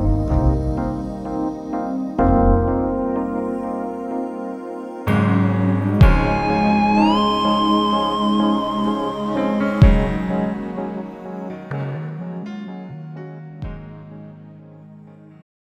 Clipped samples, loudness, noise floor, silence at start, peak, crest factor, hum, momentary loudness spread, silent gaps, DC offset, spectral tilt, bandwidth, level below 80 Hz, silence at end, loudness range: under 0.1%; -20 LUFS; -42 dBFS; 0 s; 0 dBFS; 20 dB; none; 18 LU; none; under 0.1%; -8 dB/octave; 11 kHz; -26 dBFS; 0.65 s; 14 LU